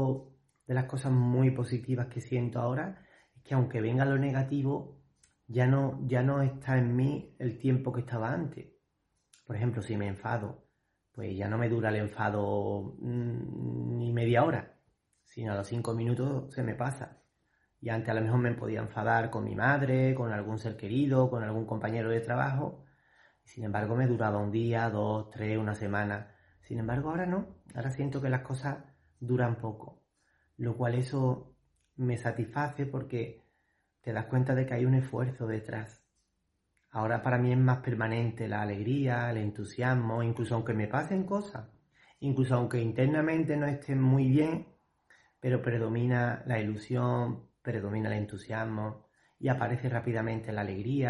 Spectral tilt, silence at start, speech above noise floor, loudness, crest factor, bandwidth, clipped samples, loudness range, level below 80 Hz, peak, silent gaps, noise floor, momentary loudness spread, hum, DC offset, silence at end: -8.5 dB/octave; 0 s; 48 dB; -32 LUFS; 20 dB; 11 kHz; under 0.1%; 5 LU; -64 dBFS; -12 dBFS; none; -79 dBFS; 10 LU; none; under 0.1%; 0 s